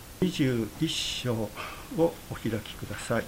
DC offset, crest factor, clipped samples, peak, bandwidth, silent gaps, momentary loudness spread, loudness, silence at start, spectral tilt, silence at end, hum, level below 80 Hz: under 0.1%; 18 dB; under 0.1%; -12 dBFS; 16 kHz; none; 9 LU; -30 LUFS; 0 s; -5 dB/octave; 0 s; none; -50 dBFS